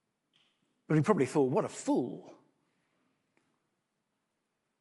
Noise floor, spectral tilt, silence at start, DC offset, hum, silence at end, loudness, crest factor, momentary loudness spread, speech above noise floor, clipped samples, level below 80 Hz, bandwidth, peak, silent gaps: -83 dBFS; -7 dB/octave; 0.9 s; under 0.1%; none; 2.5 s; -31 LUFS; 24 dB; 9 LU; 53 dB; under 0.1%; -78 dBFS; 11.5 kHz; -12 dBFS; none